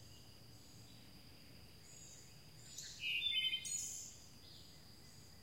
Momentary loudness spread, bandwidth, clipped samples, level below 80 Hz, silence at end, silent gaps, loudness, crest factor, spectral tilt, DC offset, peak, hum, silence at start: 23 LU; 16 kHz; under 0.1%; -72 dBFS; 0 s; none; -40 LUFS; 20 dB; 0 dB/octave; under 0.1%; -28 dBFS; none; 0 s